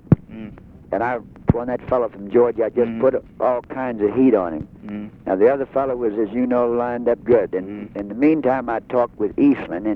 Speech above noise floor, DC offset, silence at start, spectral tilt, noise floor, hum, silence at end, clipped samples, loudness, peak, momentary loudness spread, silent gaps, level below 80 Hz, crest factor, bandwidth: 19 dB; under 0.1%; 0.1 s; -11 dB/octave; -38 dBFS; none; 0 s; under 0.1%; -20 LUFS; 0 dBFS; 13 LU; none; -44 dBFS; 20 dB; 4.7 kHz